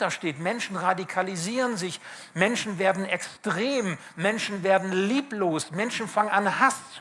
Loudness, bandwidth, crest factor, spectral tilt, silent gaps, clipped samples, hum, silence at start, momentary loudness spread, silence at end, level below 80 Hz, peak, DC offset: -26 LUFS; 12 kHz; 20 dB; -4 dB/octave; none; under 0.1%; none; 0 s; 6 LU; 0 s; -74 dBFS; -6 dBFS; under 0.1%